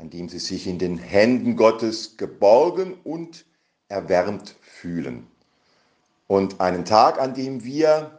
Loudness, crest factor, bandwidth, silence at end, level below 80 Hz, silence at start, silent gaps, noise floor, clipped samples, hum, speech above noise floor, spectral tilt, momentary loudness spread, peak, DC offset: -21 LUFS; 22 dB; 9.6 kHz; 0.1 s; -60 dBFS; 0 s; none; -65 dBFS; under 0.1%; none; 44 dB; -5.5 dB/octave; 17 LU; 0 dBFS; under 0.1%